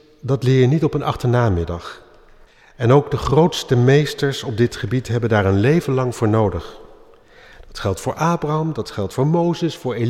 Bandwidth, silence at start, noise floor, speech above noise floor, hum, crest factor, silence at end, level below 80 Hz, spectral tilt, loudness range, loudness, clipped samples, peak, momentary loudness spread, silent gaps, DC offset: 14 kHz; 0.25 s; -47 dBFS; 30 dB; none; 16 dB; 0 s; -40 dBFS; -7 dB/octave; 5 LU; -18 LUFS; under 0.1%; -4 dBFS; 10 LU; none; under 0.1%